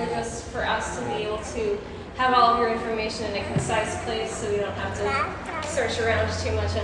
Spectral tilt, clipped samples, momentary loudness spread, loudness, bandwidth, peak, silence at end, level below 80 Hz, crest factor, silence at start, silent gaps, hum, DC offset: -4.5 dB/octave; under 0.1%; 9 LU; -25 LUFS; 11 kHz; -6 dBFS; 0 s; -44 dBFS; 18 dB; 0 s; none; none; under 0.1%